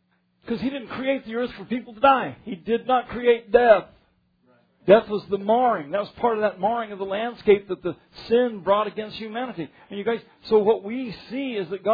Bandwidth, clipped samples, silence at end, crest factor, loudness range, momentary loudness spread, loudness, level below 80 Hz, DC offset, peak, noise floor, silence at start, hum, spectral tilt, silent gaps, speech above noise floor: 5 kHz; under 0.1%; 0 s; 22 dB; 4 LU; 14 LU; -23 LUFS; -58 dBFS; under 0.1%; -2 dBFS; -64 dBFS; 0.45 s; none; -8 dB/octave; none; 41 dB